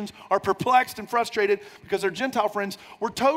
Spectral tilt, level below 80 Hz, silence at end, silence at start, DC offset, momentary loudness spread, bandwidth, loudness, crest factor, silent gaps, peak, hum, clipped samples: -4 dB/octave; -64 dBFS; 0 s; 0 s; under 0.1%; 10 LU; 16 kHz; -25 LUFS; 18 dB; none; -8 dBFS; none; under 0.1%